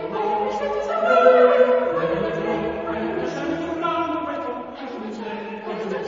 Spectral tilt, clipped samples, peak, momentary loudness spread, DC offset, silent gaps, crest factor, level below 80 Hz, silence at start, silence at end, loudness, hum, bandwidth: -6 dB/octave; under 0.1%; -2 dBFS; 16 LU; under 0.1%; none; 18 dB; -54 dBFS; 0 s; 0 s; -21 LUFS; none; 7.4 kHz